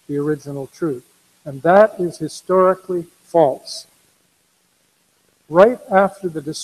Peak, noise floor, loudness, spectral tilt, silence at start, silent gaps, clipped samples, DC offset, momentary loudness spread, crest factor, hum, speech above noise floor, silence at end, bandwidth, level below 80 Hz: 0 dBFS; -62 dBFS; -17 LUFS; -6 dB/octave; 0.1 s; none; under 0.1%; under 0.1%; 18 LU; 18 dB; none; 45 dB; 0 s; 14 kHz; -60 dBFS